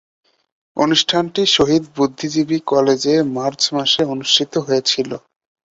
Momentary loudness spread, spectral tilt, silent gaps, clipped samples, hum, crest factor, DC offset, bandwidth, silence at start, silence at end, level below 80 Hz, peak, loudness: 7 LU; -3.5 dB/octave; none; under 0.1%; none; 16 dB; under 0.1%; 8 kHz; 0.75 s; 0.6 s; -56 dBFS; -2 dBFS; -16 LUFS